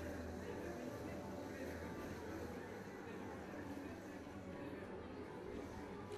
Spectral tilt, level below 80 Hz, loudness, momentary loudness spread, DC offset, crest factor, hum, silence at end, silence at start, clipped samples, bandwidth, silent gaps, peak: -6 dB/octave; -64 dBFS; -50 LUFS; 3 LU; under 0.1%; 12 dB; none; 0 s; 0 s; under 0.1%; 14 kHz; none; -36 dBFS